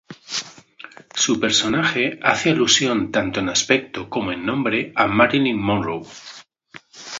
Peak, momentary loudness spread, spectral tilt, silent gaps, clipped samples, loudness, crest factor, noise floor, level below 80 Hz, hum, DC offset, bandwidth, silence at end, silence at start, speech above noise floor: 0 dBFS; 14 LU; -3 dB/octave; none; under 0.1%; -19 LUFS; 20 dB; -46 dBFS; -52 dBFS; none; under 0.1%; 7.8 kHz; 0 s; 0.1 s; 27 dB